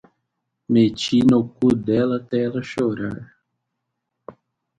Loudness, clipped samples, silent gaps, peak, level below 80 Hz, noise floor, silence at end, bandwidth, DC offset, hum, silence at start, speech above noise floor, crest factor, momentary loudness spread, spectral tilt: -20 LUFS; under 0.1%; none; -4 dBFS; -54 dBFS; -78 dBFS; 0.45 s; 9 kHz; under 0.1%; none; 0.7 s; 59 dB; 16 dB; 9 LU; -7 dB/octave